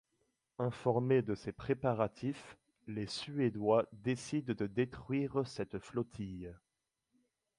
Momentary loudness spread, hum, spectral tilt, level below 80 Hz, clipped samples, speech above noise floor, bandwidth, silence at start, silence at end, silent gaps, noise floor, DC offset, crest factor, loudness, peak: 13 LU; none; -7 dB/octave; -66 dBFS; under 0.1%; 47 dB; 11.5 kHz; 0.6 s; 1.05 s; none; -83 dBFS; under 0.1%; 20 dB; -37 LUFS; -18 dBFS